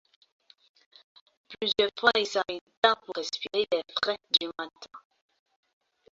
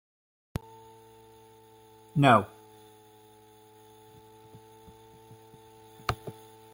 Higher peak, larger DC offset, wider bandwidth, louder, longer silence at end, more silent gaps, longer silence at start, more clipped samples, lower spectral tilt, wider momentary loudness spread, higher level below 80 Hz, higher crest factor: about the same, -6 dBFS vs -8 dBFS; neither; second, 7.8 kHz vs 16.5 kHz; about the same, -27 LUFS vs -28 LUFS; first, 1.15 s vs 0.45 s; first, 2.61-2.67 s, 2.77-2.82 s vs none; second, 1.5 s vs 2.15 s; neither; second, -2 dB/octave vs -6.5 dB/octave; second, 14 LU vs 31 LU; second, -70 dBFS vs -58 dBFS; about the same, 26 dB vs 26 dB